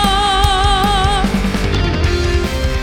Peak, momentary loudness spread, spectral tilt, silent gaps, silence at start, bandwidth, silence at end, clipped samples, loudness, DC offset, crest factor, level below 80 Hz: -2 dBFS; 4 LU; -4.5 dB/octave; none; 0 s; 16.5 kHz; 0 s; under 0.1%; -15 LUFS; under 0.1%; 12 dB; -18 dBFS